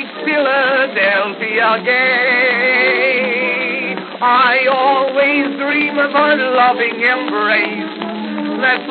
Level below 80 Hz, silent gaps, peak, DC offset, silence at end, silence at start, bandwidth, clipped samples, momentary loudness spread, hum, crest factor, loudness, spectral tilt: under -90 dBFS; none; 0 dBFS; under 0.1%; 0 s; 0 s; 4.9 kHz; under 0.1%; 7 LU; none; 14 dB; -13 LUFS; -0.5 dB/octave